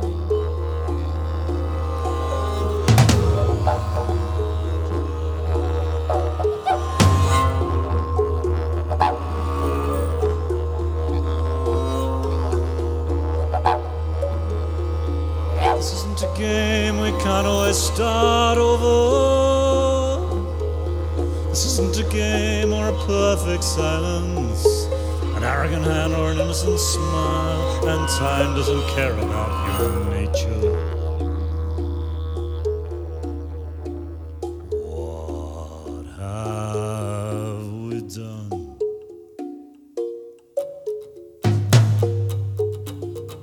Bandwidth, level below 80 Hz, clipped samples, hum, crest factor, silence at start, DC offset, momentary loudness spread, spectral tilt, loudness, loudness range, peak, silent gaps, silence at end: over 20 kHz; -28 dBFS; under 0.1%; none; 20 dB; 0 s; under 0.1%; 14 LU; -5.5 dB/octave; -22 LUFS; 10 LU; -2 dBFS; none; 0 s